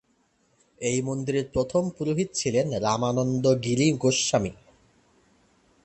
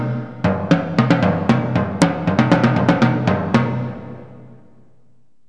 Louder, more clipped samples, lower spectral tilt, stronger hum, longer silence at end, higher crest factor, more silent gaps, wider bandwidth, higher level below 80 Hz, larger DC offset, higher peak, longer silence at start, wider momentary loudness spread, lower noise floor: second, -25 LUFS vs -17 LUFS; neither; second, -5 dB/octave vs -7 dB/octave; neither; first, 1.3 s vs 1 s; about the same, 18 dB vs 18 dB; neither; second, 8.8 kHz vs 10.5 kHz; second, -54 dBFS vs -48 dBFS; second, under 0.1% vs 0.5%; second, -10 dBFS vs 0 dBFS; first, 0.8 s vs 0 s; second, 6 LU vs 11 LU; first, -67 dBFS vs -60 dBFS